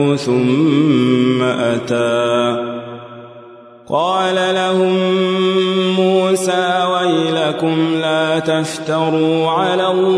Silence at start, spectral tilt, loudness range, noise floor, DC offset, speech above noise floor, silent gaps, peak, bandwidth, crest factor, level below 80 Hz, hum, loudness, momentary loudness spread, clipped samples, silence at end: 0 s; -5.5 dB/octave; 3 LU; -39 dBFS; under 0.1%; 24 dB; none; -2 dBFS; 11 kHz; 14 dB; -64 dBFS; none; -15 LUFS; 5 LU; under 0.1%; 0 s